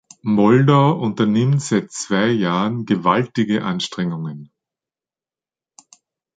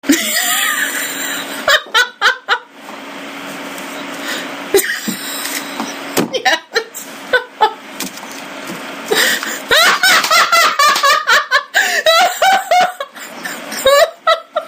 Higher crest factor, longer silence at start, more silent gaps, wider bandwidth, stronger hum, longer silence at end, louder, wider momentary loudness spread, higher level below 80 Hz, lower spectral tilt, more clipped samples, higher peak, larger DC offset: about the same, 18 dB vs 16 dB; first, 0.25 s vs 0.05 s; neither; second, 9.4 kHz vs 16 kHz; neither; first, 1.9 s vs 0 s; second, -18 LUFS vs -13 LUFS; second, 10 LU vs 17 LU; about the same, -60 dBFS vs -56 dBFS; first, -6 dB/octave vs -0.5 dB/octave; neither; about the same, -2 dBFS vs 0 dBFS; neither